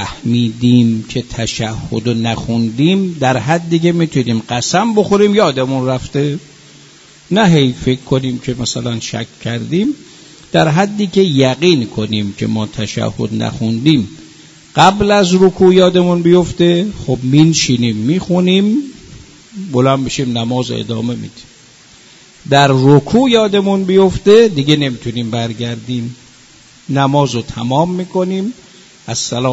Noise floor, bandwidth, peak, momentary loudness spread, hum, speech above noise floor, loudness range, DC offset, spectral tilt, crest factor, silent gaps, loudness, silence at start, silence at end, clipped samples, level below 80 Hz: -43 dBFS; 8 kHz; 0 dBFS; 11 LU; none; 30 dB; 6 LU; under 0.1%; -5.5 dB/octave; 14 dB; none; -13 LUFS; 0 s; 0 s; under 0.1%; -42 dBFS